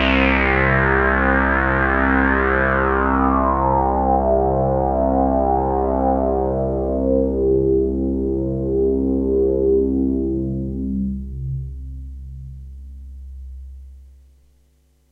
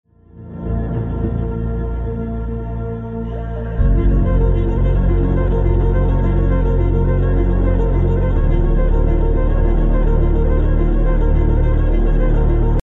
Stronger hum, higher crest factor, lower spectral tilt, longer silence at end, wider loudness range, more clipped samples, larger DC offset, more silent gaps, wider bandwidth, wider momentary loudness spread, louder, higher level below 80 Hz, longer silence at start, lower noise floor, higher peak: neither; first, 18 dB vs 10 dB; second, -9 dB/octave vs -11 dB/octave; first, 1.05 s vs 0.15 s; first, 14 LU vs 5 LU; neither; neither; neither; first, 5.2 kHz vs 3.5 kHz; first, 20 LU vs 8 LU; about the same, -18 LUFS vs -18 LUFS; second, -28 dBFS vs -16 dBFS; second, 0 s vs 0.35 s; first, -58 dBFS vs -37 dBFS; about the same, -2 dBFS vs -4 dBFS